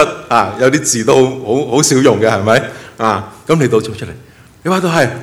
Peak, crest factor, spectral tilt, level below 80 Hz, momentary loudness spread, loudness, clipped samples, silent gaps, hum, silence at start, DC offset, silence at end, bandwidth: 0 dBFS; 12 dB; -4.5 dB/octave; -48 dBFS; 11 LU; -12 LUFS; 0.3%; none; none; 0 s; under 0.1%; 0 s; 16 kHz